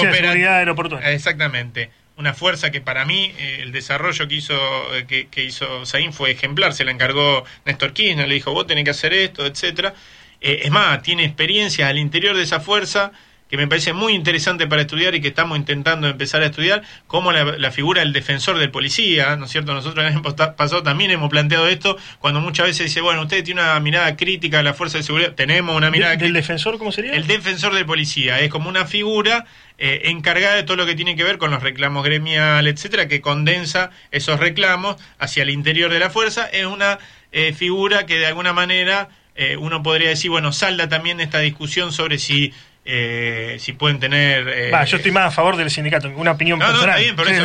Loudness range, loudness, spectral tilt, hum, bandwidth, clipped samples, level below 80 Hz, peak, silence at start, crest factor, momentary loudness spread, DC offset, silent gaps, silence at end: 2 LU; -17 LUFS; -4 dB/octave; none; 10 kHz; under 0.1%; -52 dBFS; -2 dBFS; 0 s; 16 dB; 7 LU; under 0.1%; none; 0 s